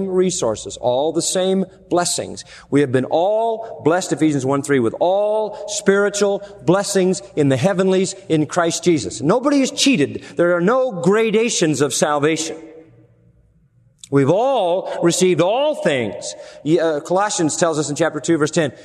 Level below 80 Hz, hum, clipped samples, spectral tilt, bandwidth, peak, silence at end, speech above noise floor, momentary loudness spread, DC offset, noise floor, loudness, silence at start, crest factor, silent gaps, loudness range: -58 dBFS; none; under 0.1%; -4.5 dB/octave; 13.5 kHz; 0 dBFS; 0 s; 38 dB; 6 LU; under 0.1%; -55 dBFS; -18 LUFS; 0 s; 18 dB; none; 3 LU